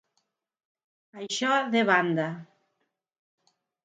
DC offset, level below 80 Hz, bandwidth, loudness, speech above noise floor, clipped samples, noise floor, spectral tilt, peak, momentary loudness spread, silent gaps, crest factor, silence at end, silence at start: under 0.1%; -84 dBFS; 9.4 kHz; -25 LUFS; 53 dB; under 0.1%; -79 dBFS; -4 dB/octave; -8 dBFS; 17 LU; none; 22 dB; 1.4 s; 1.15 s